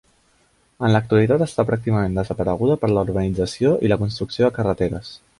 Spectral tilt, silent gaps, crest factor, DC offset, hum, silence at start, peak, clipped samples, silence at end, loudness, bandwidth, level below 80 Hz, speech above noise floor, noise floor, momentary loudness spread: -7.5 dB/octave; none; 18 dB; under 0.1%; none; 0.8 s; -2 dBFS; under 0.1%; 0.25 s; -20 LUFS; 11.5 kHz; -42 dBFS; 41 dB; -60 dBFS; 6 LU